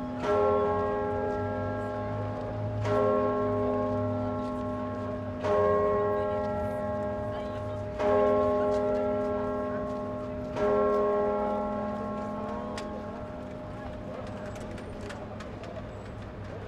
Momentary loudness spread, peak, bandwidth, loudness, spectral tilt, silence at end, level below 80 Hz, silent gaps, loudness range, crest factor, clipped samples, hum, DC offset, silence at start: 14 LU; -14 dBFS; 9.8 kHz; -30 LUFS; -8 dB/octave; 0 s; -50 dBFS; none; 9 LU; 16 dB; under 0.1%; none; under 0.1%; 0 s